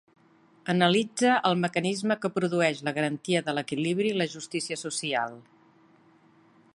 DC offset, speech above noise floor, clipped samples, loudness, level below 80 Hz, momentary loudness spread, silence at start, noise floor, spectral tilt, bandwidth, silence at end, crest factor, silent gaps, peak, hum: under 0.1%; 33 dB; under 0.1%; -27 LUFS; -74 dBFS; 8 LU; 0.65 s; -60 dBFS; -4.5 dB/octave; 11.5 kHz; 1.35 s; 22 dB; none; -6 dBFS; none